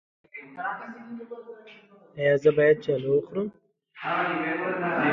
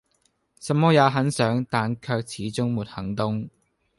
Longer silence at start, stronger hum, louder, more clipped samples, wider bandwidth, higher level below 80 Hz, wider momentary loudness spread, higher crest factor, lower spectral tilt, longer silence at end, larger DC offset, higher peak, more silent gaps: second, 0.35 s vs 0.6 s; neither; about the same, -25 LUFS vs -24 LUFS; neither; second, 7.2 kHz vs 11.5 kHz; second, -68 dBFS vs -56 dBFS; first, 22 LU vs 12 LU; about the same, 18 dB vs 18 dB; first, -7.5 dB/octave vs -6 dB/octave; second, 0 s vs 0.5 s; neither; about the same, -8 dBFS vs -6 dBFS; neither